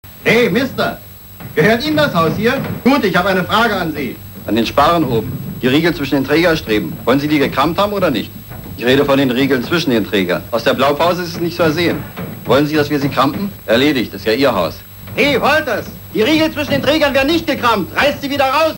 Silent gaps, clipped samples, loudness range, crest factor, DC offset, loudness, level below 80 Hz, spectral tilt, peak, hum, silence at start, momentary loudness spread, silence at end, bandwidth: none; under 0.1%; 1 LU; 14 dB; under 0.1%; -15 LUFS; -40 dBFS; -5.5 dB/octave; 0 dBFS; none; 0.05 s; 9 LU; 0 s; 16.5 kHz